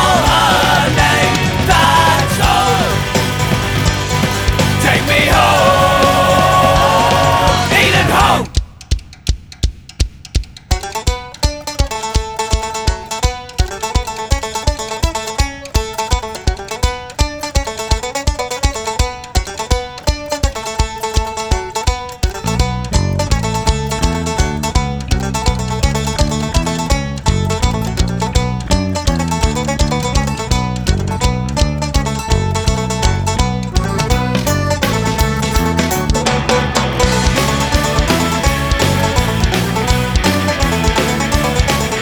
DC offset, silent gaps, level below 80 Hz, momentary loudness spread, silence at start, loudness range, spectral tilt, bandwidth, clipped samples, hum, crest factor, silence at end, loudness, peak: under 0.1%; none; -20 dBFS; 9 LU; 0 s; 8 LU; -4.5 dB/octave; over 20 kHz; under 0.1%; none; 14 dB; 0 s; -15 LUFS; 0 dBFS